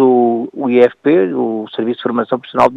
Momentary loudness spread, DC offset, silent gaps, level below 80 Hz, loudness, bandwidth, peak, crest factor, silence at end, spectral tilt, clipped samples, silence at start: 8 LU; under 0.1%; none; -58 dBFS; -15 LUFS; 7.4 kHz; 0 dBFS; 14 dB; 0 s; -7.5 dB/octave; under 0.1%; 0 s